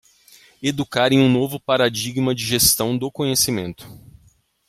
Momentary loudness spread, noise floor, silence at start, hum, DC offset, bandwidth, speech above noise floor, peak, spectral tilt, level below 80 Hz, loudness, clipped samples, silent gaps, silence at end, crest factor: 11 LU; -57 dBFS; 0.6 s; none; under 0.1%; 16.5 kHz; 38 dB; -2 dBFS; -3.5 dB/octave; -48 dBFS; -19 LUFS; under 0.1%; none; 0.75 s; 20 dB